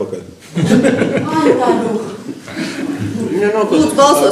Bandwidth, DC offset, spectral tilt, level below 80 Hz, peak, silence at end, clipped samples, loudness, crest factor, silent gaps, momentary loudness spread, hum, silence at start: 15.5 kHz; under 0.1%; -5.5 dB/octave; -52 dBFS; 0 dBFS; 0 s; under 0.1%; -14 LUFS; 14 dB; none; 15 LU; none; 0 s